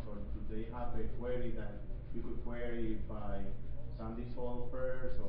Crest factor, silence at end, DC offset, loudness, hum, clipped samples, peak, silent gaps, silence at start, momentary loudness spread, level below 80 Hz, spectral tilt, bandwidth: 12 dB; 0 s; under 0.1%; -43 LUFS; none; under 0.1%; -22 dBFS; none; 0 s; 6 LU; -42 dBFS; -7.5 dB/octave; 3.7 kHz